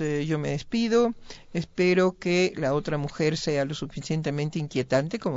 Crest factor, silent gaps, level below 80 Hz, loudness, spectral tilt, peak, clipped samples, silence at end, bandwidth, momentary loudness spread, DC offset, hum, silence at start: 16 dB; none; -54 dBFS; -26 LUFS; -6 dB/octave; -10 dBFS; under 0.1%; 0 s; 7.8 kHz; 8 LU; under 0.1%; none; 0 s